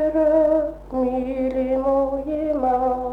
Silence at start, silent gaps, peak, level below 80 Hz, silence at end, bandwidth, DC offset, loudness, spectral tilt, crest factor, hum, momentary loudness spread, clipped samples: 0 s; none; -8 dBFS; -42 dBFS; 0 s; 5.2 kHz; under 0.1%; -21 LUFS; -8.5 dB/octave; 12 dB; none; 7 LU; under 0.1%